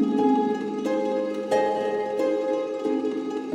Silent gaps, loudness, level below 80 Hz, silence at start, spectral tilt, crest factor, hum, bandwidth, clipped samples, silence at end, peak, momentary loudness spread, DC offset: none; -25 LUFS; -82 dBFS; 0 s; -6 dB/octave; 14 dB; none; 12 kHz; under 0.1%; 0 s; -10 dBFS; 6 LU; under 0.1%